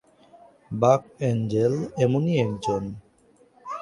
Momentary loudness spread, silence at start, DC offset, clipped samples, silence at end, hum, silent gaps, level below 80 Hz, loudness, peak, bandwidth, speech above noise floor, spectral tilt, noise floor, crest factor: 16 LU; 0.7 s; under 0.1%; under 0.1%; 0 s; none; none; -58 dBFS; -24 LUFS; -4 dBFS; 11.5 kHz; 36 dB; -7.5 dB/octave; -59 dBFS; 22 dB